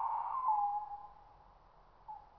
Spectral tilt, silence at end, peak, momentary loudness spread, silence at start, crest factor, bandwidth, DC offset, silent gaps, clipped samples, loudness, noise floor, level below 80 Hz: -6 dB/octave; 0.1 s; -22 dBFS; 22 LU; 0 s; 16 dB; 5.4 kHz; under 0.1%; none; under 0.1%; -36 LUFS; -63 dBFS; -68 dBFS